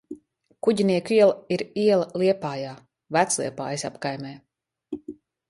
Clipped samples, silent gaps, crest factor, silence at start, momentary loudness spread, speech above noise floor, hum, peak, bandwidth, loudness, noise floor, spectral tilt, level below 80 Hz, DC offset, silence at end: under 0.1%; none; 18 dB; 0.1 s; 19 LU; 27 dB; none; -6 dBFS; 11.5 kHz; -24 LUFS; -50 dBFS; -4.5 dB/octave; -68 dBFS; under 0.1%; 0.35 s